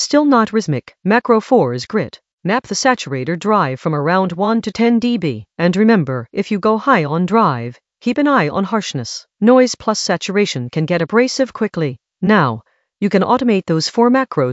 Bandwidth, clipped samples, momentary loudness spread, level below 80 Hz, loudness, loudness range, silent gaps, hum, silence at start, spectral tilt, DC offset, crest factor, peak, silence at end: 8.2 kHz; under 0.1%; 9 LU; -58 dBFS; -16 LUFS; 2 LU; 2.33-2.38 s; none; 0 s; -5.5 dB/octave; under 0.1%; 16 dB; 0 dBFS; 0 s